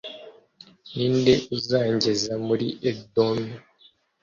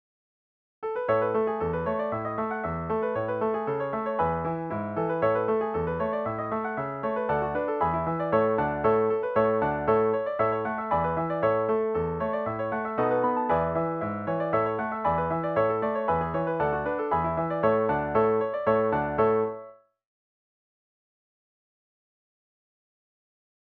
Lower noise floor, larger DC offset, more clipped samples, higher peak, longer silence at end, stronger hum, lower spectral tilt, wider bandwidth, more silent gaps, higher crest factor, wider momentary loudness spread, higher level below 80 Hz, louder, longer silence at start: first, -59 dBFS vs -48 dBFS; neither; neither; first, -6 dBFS vs -12 dBFS; second, 0.65 s vs 3.9 s; neither; second, -5.5 dB/octave vs -10 dB/octave; first, 7.6 kHz vs 4.6 kHz; neither; about the same, 20 dB vs 16 dB; first, 16 LU vs 6 LU; second, -58 dBFS vs -52 dBFS; first, -24 LUFS vs -27 LUFS; second, 0.05 s vs 0.8 s